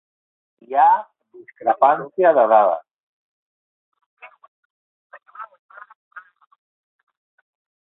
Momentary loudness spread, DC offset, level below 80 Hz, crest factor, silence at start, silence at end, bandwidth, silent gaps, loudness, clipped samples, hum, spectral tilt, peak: 24 LU; under 0.1%; -78 dBFS; 20 dB; 0.7 s; 1.65 s; 4 kHz; 2.94-3.92 s, 4.06-4.17 s, 4.48-5.10 s, 5.59-5.69 s, 5.95-6.11 s; -17 LUFS; under 0.1%; none; -9 dB/octave; -2 dBFS